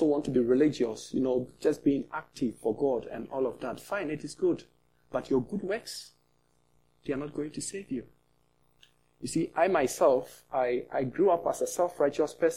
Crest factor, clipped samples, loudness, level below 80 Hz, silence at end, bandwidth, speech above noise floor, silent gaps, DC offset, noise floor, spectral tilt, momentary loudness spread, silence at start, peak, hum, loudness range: 20 dB; under 0.1%; -30 LUFS; -64 dBFS; 0 s; 16 kHz; 42 dB; none; under 0.1%; -71 dBFS; -5.5 dB/octave; 12 LU; 0 s; -10 dBFS; 60 Hz at -65 dBFS; 9 LU